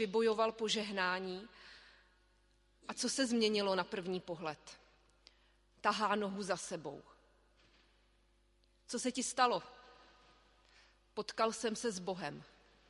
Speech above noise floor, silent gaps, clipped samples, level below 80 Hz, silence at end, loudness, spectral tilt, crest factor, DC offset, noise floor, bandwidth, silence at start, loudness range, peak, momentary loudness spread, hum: 35 dB; none; under 0.1%; -72 dBFS; 0.45 s; -37 LUFS; -3 dB/octave; 22 dB; under 0.1%; -72 dBFS; 11.5 kHz; 0 s; 3 LU; -18 dBFS; 20 LU; 50 Hz at -75 dBFS